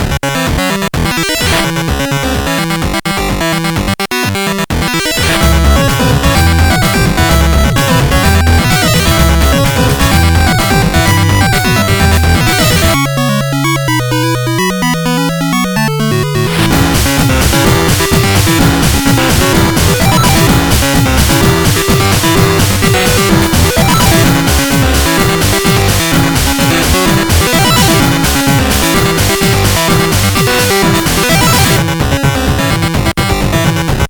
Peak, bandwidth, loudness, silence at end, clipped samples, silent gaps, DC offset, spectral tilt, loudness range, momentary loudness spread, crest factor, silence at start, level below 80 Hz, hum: 0 dBFS; over 20 kHz; -9 LUFS; 0 s; under 0.1%; none; under 0.1%; -4.5 dB/octave; 3 LU; 4 LU; 10 dB; 0 s; -18 dBFS; none